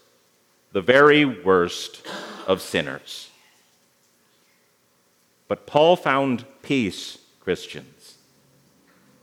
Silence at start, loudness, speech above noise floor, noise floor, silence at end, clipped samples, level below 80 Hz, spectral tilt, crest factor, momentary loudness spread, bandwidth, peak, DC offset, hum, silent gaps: 0.75 s; -21 LUFS; 42 dB; -63 dBFS; 1.4 s; under 0.1%; -68 dBFS; -5 dB/octave; 22 dB; 20 LU; 15.5 kHz; -2 dBFS; under 0.1%; 60 Hz at -60 dBFS; none